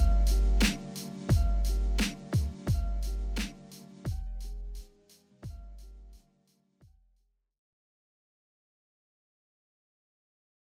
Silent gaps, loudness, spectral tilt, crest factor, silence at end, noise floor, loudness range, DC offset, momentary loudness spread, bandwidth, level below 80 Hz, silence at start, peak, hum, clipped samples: none; -32 LUFS; -5 dB/octave; 20 dB; 4.6 s; -73 dBFS; 23 LU; under 0.1%; 21 LU; 16 kHz; -34 dBFS; 0 s; -12 dBFS; none; under 0.1%